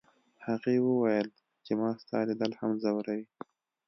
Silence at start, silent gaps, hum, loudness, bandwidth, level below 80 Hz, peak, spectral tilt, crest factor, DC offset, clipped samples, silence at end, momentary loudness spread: 0.4 s; none; none; -31 LUFS; 6.2 kHz; -78 dBFS; -14 dBFS; -8 dB/octave; 18 dB; under 0.1%; under 0.1%; 0.65 s; 16 LU